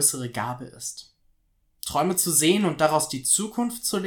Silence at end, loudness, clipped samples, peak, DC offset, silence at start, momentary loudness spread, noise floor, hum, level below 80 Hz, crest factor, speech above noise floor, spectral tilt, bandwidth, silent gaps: 0 s; -23 LUFS; under 0.1%; -6 dBFS; under 0.1%; 0 s; 15 LU; -67 dBFS; none; -60 dBFS; 20 dB; 43 dB; -3 dB/octave; 18 kHz; none